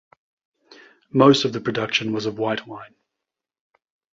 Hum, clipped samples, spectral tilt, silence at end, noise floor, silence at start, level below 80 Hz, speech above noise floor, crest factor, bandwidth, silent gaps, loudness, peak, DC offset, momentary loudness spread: none; under 0.1%; -5.5 dB/octave; 1.25 s; -85 dBFS; 1.15 s; -64 dBFS; 65 dB; 22 dB; 7.8 kHz; none; -20 LUFS; -2 dBFS; under 0.1%; 15 LU